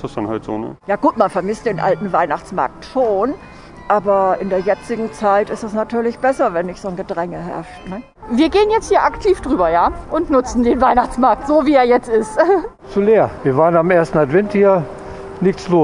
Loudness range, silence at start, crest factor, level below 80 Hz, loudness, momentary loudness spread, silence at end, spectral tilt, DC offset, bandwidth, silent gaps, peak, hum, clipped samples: 5 LU; 0 s; 16 dB; -40 dBFS; -16 LUFS; 11 LU; 0 s; -6.5 dB/octave; under 0.1%; 11 kHz; none; 0 dBFS; none; under 0.1%